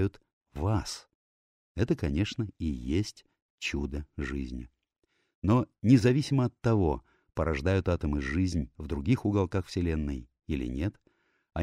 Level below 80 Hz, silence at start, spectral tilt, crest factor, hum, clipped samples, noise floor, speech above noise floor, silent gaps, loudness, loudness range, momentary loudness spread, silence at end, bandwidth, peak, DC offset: -42 dBFS; 0 s; -7 dB/octave; 20 dB; none; under 0.1%; under -90 dBFS; over 61 dB; 0.33-0.41 s, 1.15-1.75 s, 3.42-3.58 s, 5.35-5.42 s; -30 LUFS; 6 LU; 12 LU; 0 s; 12.5 kHz; -8 dBFS; under 0.1%